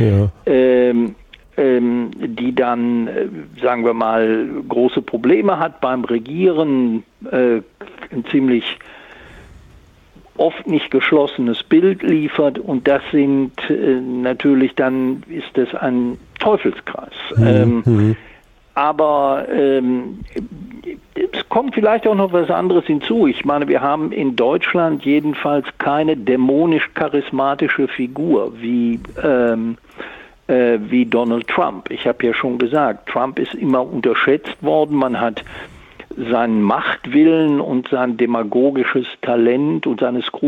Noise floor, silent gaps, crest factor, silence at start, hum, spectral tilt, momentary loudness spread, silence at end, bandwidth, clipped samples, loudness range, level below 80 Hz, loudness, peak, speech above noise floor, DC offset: -47 dBFS; none; 14 dB; 0 s; none; -8.5 dB/octave; 9 LU; 0 s; 5.2 kHz; under 0.1%; 3 LU; -50 dBFS; -17 LUFS; -2 dBFS; 30 dB; under 0.1%